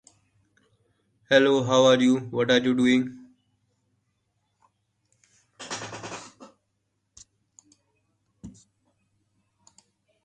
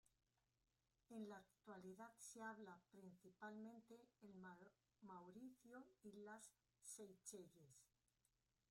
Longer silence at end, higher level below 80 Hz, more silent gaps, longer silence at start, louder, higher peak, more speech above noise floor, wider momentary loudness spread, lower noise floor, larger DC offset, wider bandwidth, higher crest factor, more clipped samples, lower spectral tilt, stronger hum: first, 1.75 s vs 0.85 s; first, -66 dBFS vs under -90 dBFS; neither; first, 1.3 s vs 0.05 s; first, -22 LUFS vs -62 LUFS; first, -6 dBFS vs -44 dBFS; first, 56 dB vs 27 dB; first, 19 LU vs 9 LU; second, -76 dBFS vs -89 dBFS; neither; second, 9.2 kHz vs 16 kHz; about the same, 22 dB vs 20 dB; neither; about the same, -4.5 dB/octave vs -4 dB/octave; neither